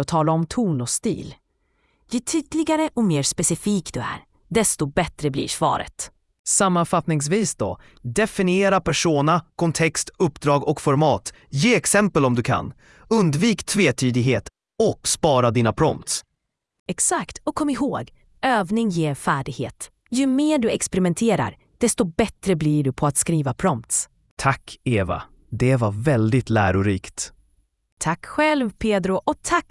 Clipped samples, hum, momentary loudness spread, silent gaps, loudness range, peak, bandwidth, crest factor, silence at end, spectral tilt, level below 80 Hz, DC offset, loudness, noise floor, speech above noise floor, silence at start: under 0.1%; none; 10 LU; 6.39-6.44 s, 16.79-16.86 s, 24.31-24.37 s, 27.92-27.97 s; 3 LU; -2 dBFS; 12 kHz; 20 dB; 0.1 s; -4.5 dB/octave; -48 dBFS; under 0.1%; -21 LUFS; -78 dBFS; 57 dB; 0 s